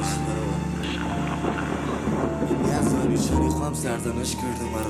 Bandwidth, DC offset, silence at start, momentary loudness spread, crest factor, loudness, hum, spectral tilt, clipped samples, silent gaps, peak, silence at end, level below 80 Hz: over 20 kHz; under 0.1%; 0 s; 5 LU; 16 dB; -25 LUFS; none; -5.5 dB/octave; under 0.1%; none; -10 dBFS; 0 s; -38 dBFS